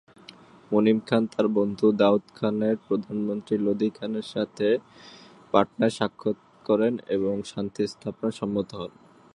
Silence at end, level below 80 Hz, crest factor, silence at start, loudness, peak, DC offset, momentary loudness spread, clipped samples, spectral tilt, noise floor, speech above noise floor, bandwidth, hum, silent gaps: 0.5 s; -64 dBFS; 22 dB; 0.7 s; -26 LUFS; -4 dBFS; under 0.1%; 9 LU; under 0.1%; -7 dB/octave; -50 dBFS; 25 dB; 10.5 kHz; none; none